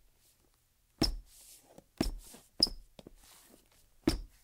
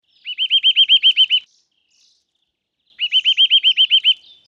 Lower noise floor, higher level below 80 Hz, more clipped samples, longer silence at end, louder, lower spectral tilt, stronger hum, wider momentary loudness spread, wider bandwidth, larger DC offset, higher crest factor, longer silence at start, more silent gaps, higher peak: about the same, -71 dBFS vs -72 dBFS; first, -46 dBFS vs -80 dBFS; neither; second, 0.15 s vs 0.35 s; second, -34 LUFS vs -12 LUFS; first, -4 dB/octave vs 5 dB/octave; neither; first, 26 LU vs 9 LU; first, 16.5 kHz vs 7.2 kHz; neither; first, 30 dB vs 14 dB; first, 1 s vs 0.25 s; neither; second, -10 dBFS vs -4 dBFS